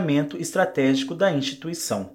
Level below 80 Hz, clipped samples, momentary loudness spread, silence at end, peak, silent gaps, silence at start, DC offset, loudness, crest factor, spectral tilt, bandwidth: -66 dBFS; under 0.1%; 7 LU; 0 s; -8 dBFS; none; 0 s; under 0.1%; -23 LUFS; 16 dB; -5 dB/octave; 16.5 kHz